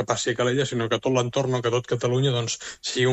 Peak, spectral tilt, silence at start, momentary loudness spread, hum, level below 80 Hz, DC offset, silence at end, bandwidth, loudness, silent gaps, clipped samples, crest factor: -8 dBFS; -4.5 dB/octave; 0 s; 4 LU; none; -60 dBFS; under 0.1%; 0 s; 8.4 kHz; -24 LUFS; none; under 0.1%; 16 dB